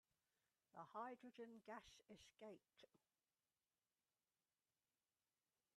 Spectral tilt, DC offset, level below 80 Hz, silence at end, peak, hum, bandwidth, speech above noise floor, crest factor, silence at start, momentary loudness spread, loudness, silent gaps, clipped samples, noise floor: -4.5 dB/octave; under 0.1%; under -90 dBFS; 2.8 s; -42 dBFS; none; 11.5 kHz; over 30 dB; 24 dB; 0.75 s; 12 LU; -60 LUFS; none; under 0.1%; under -90 dBFS